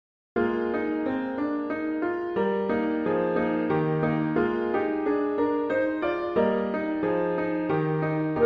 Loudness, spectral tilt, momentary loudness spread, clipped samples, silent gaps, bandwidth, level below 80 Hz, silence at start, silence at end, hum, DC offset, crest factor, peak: -26 LUFS; -9.5 dB/octave; 3 LU; under 0.1%; none; 5.2 kHz; -58 dBFS; 0.35 s; 0 s; none; under 0.1%; 14 dB; -12 dBFS